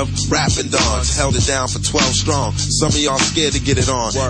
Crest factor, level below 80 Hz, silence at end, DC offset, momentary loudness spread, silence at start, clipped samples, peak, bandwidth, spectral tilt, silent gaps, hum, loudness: 14 dB; -26 dBFS; 0 s; under 0.1%; 3 LU; 0 s; under 0.1%; -2 dBFS; 10.5 kHz; -3.5 dB/octave; none; none; -16 LUFS